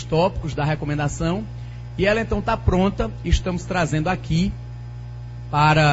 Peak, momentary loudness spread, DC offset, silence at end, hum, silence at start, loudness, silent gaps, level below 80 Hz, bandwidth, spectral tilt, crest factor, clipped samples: -4 dBFS; 15 LU; under 0.1%; 0 s; 60 Hz at -35 dBFS; 0 s; -22 LUFS; none; -30 dBFS; 8 kHz; -6 dB/octave; 18 dB; under 0.1%